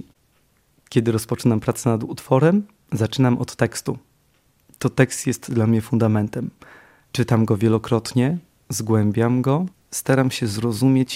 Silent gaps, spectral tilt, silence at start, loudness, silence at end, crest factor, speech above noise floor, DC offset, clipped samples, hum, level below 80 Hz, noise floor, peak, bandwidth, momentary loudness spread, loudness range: none; -6.5 dB/octave; 0.9 s; -21 LUFS; 0 s; 20 dB; 42 dB; under 0.1%; under 0.1%; none; -56 dBFS; -62 dBFS; 0 dBFS; 16 kHz; 9 LU; 2 LU